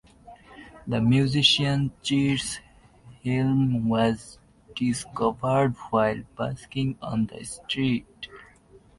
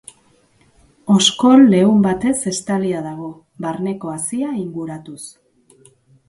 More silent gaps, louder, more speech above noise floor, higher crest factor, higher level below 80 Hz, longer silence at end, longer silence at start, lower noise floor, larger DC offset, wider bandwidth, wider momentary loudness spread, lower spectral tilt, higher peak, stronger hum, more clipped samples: neither; second, -25 LUFS vs -16 LUFS; second, 30 dB vs 39 dB; about the same, 20 dB vs 18 dB; about the same, -52 dBFS vs -56 dBFS; second, 0.55 s vs 1 s; second, 0.25 s vs 1.05 s; about the same, -54 dBFS vs -55 dBFS; neither; about the same, 11.5 kHz vs 11.5 kHz; second, 14 LU vs 22 LU; about the same, -5.5 dB/octave vs -5 dB/octave; second, -6 dBFS vs 0 dBFS; neither; neither